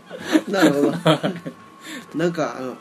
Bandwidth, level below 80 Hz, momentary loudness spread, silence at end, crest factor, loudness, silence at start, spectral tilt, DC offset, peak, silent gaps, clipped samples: 13.5 kHz; -68 dBFS; 19 LU; 0 s; 20 dB; -20 LUFS; 0.05 s; -5.5 dB/octave; under 0.1%; -2 dBFS; none; under 0.1%